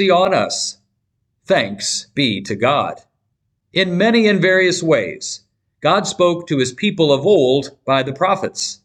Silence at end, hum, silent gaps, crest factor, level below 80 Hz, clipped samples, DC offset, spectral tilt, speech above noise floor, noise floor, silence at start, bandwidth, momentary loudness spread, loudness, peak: 0.1 s; none; none; 14 dB; -60 dBFS; under 0.1%; under 0.1%; -4 dB/octave; 54 dB; -70 dBFS; 0 s; 12 kHz; 9 LU; -16 LUFS; -4 dBFS